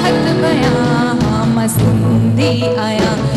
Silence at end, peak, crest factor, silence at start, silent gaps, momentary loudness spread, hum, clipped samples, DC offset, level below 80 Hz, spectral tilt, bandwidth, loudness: 0 s; -4 dBFS; 10 dB; 0 s; none; 2 LU; none; under 0.1%; under 0.1%; -34 dBFS; -6 dB/octave; 14 kHz; -13 LUFS